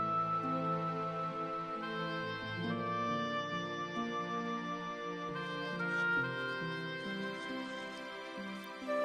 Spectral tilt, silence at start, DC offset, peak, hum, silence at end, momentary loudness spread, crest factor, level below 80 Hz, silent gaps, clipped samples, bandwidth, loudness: -5.5 dB/octave; 0 s; under 0.1%; -24 dBFS; none; 0 s; 9 LU; 14 dB; -72 dBFS; none; under 0.1%; 14 kHz; -38 LUFS